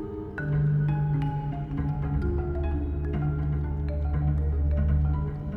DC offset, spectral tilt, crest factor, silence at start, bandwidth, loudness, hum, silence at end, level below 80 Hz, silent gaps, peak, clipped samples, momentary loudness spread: under 0.1%; -11 dB/octave; 12 dB; 0 s; 3.6 kHz; -28 LUFS; none; 0 s; -32 dBFS; none; -14 dBFS; under 0.1%; 5 LU